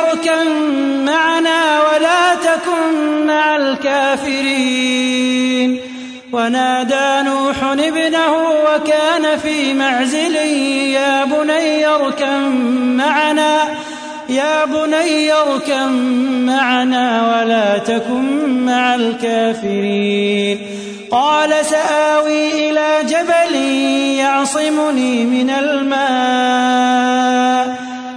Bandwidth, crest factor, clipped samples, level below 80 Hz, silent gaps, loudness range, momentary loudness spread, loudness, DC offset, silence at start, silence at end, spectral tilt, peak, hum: 11 kHz; 12 dB; under 0.1%; -58 dBFS; none; 2 LU; 4 LU; -14 LUFS; under 0.1%; 0 s; 0 s; -3 dB/octave; -2 dBFS; none